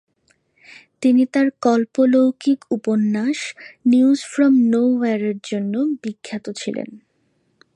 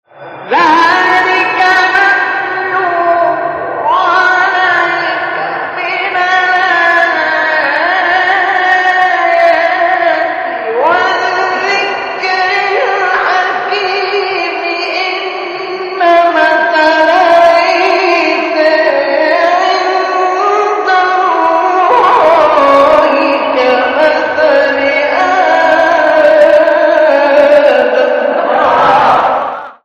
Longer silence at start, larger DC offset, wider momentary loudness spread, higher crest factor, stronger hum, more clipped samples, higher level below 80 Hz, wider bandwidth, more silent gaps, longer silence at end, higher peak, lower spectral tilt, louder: first, 1 s vs 0.15 s; neither; first, 13 LU vs 7 LU; first, 16 dB vs 10 dB; neither; second, under 0.1% vs 0.2%; second, -72 dBFS vs -52 dBFS; first, 10.5 kHz vs 9 kHz; neither; first, 0.8 s vs 0.1 s; second, -4 dBFS vs 0 dBFS; first, -6 dB/octave vs -3.5 dB/octave; second, -19 LUFS vs -9 LUFS